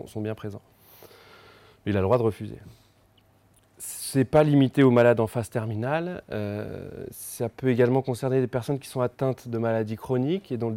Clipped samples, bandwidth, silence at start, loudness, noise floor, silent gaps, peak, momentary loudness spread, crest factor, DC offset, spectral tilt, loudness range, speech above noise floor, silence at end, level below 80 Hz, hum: under 0.1%; 17 kHz; 0 s; -25 LUFS; -61 dBFS; none; -8 dBFS; 18 LU; 18 dB; under 0.1%; -7 dB/octave; 7 LU; 36 dB; 0 s; -60 dBFS; none